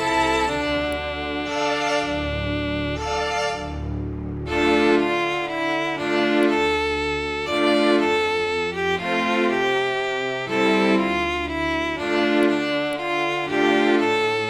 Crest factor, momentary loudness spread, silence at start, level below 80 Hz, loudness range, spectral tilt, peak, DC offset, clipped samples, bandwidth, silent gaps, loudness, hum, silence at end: 16 dB; 7 LU; 0 s; -40 dBFS; 3 LU; -5 dB/octave; -6 dBFS; under 0.1%; under 0.1%; 13 kHz; none; -22 LUFS; none; 0 s